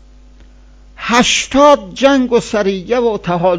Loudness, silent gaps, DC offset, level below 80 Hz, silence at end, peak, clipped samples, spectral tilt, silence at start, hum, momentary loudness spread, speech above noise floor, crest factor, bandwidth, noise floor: -12 LUFS; none; under 0.1%; -40 dBFS; 0 s; 0 dBFS; 0.3%; -3.5 dB/octave; 1 s; none; 7 LU; 29 dB; 14 dB; 8 kHz; -41 dBFS